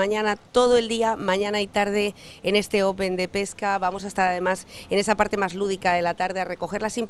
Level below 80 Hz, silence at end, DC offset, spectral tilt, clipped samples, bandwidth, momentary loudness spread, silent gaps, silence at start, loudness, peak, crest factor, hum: -52 dBFS; 0 s; under 0.1%; -4 dB/octave; under 0.1%; 13.5 kHz; 6 LU; none; 0 s; -24 LUFS; -4 dBFS; 18 dB; none